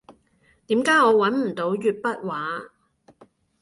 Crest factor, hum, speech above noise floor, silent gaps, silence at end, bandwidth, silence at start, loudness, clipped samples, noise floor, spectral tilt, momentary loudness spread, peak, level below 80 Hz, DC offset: 18 dB; none; 41 dB; none; 0.95 s; 11.5 kHz; 0.1 s; -22 LUFS; under 0.1%; -62 dBFS; -5 dB/octave; 12 LU; -6 dBFS; -68 dBFS; under 0.1%